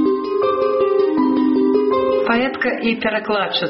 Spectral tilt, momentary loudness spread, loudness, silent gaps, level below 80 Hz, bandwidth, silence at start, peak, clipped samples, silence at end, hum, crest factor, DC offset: -2.5 dB/octave; 3 LU; -17 LUFS; none; -54 dBFS; 5.8 kHz; 0 s; -4 dBFS; under 0.1%; 0 s; none; 14 dB; under 0.1%